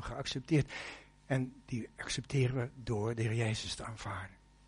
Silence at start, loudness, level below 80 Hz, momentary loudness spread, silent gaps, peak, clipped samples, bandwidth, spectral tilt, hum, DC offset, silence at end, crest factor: 0 s; -36 LUFS; -56 dBFS; 11 LU; none; -20 dBFS; under 0.1%; 10.5 kHz; -5.5 dB/octave; none; under 0.1%; 0.35 s; 16 dB